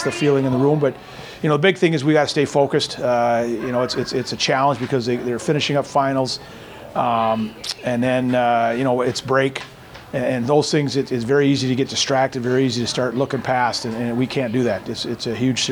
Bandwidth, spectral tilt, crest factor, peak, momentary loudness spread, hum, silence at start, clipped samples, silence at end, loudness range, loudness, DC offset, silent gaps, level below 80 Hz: 19.5 kHz; -5 dB/octave; 18 dB; -2 dBFS; 8 LU; none; 0 s; under 0.1%; 0 s; 2 LU; -20 LUFS; under 0.1%; none; -54 dBFS